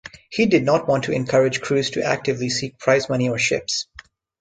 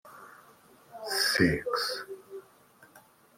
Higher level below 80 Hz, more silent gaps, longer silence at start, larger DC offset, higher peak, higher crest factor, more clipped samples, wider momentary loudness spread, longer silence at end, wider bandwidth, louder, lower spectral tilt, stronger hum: about the same, -56 dBFS vs -60 dBFS; neither; about the same, 0.05 s vs 0.05 s; neither; first, -2 dBFS vs -10 dBFS; second, 18 dB vs 24 dB; neither; second, 7 LU vs 26 LU; first, 0.55 s vs 0.4 s; second, 9.4 kHz vs 16.5 kHz; first, -20 LUFS vs -28 LUFS; about the same, -4.5 dB/octave vs -3.5 dB/octave; neither